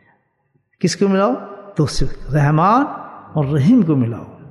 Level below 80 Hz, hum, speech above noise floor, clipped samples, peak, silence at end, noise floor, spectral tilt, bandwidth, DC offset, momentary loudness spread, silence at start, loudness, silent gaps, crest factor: -34 dBFS; none; 49 dB; under 0.1%; -2 dBFS; 0.15 s; -64 dBFS; -7 dB/octave; 12 kHz; under 0.1%; 12 LU; 0.8 s; -17 LUFS; none; 14 dB